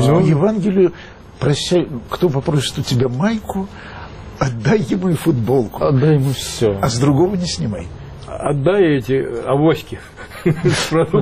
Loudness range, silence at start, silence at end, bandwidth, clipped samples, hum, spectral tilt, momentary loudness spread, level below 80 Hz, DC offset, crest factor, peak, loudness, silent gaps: 3 LU; 0 s; 0 s; 15 kHz; under 0.1%; none; -6.5 dB/octave; 16 LU; -40 dBFS; under 0.1%; 12 dB; -4 dBFS; -17 LUFS; none